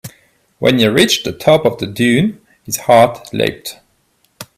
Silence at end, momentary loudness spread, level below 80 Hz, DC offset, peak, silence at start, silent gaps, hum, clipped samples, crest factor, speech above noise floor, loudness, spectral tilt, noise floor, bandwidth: 0.15 s; 10 LU; -50 dBFS; under 0.1%; 0 dBFS; 0.05 s; none; none; under 0.1%; 14 dB; 46 dB; -13 LUFS; -4.5 dB/octave; -59 dBFS; 16 kHz